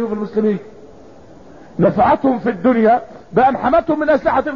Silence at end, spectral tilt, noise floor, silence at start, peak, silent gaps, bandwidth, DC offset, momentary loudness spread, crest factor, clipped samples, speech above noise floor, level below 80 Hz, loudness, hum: 0 s; -9 dB/octave; -41 dBFS; 0 s; -4 dBFS; none; 7 kHz; 0.5%; 7 LU; 12 dB; under 0.1%; 26 dB; -44 dBFS; -16 LUFS; none